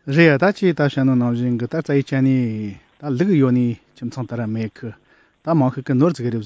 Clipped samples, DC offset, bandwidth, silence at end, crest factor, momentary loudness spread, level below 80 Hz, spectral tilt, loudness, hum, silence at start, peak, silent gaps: under 0.1%; under 0.1%; 8 kHz; 0 s; 18 dB; 15 LU; -58 dBFS; -8.5 dB/octave; -19 LUFS; none; 0.05 s; -2 dBFS; none